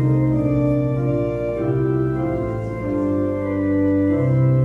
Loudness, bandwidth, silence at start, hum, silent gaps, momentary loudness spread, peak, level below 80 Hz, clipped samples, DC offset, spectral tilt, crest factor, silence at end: -20 LUFS; 3.7 kHz; 0 s; none; none; 5 LU; -8 dBFS; -38 dBFS; under 0.1%; under 0.1%; -11 dB/octave; 12 dB; 0 s